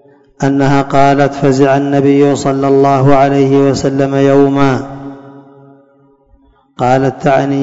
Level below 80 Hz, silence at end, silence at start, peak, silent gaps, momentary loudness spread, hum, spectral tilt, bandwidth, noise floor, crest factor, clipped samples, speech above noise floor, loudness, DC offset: -40 dBFS; 0 s; 0.4 s; 0 dBFS; none; 7 LU; none; -7 dB/octave; 8 kHz; -48 dBFS; 10 dB; under 0.1%; 39 dB; -10 LUFS; under 0.1%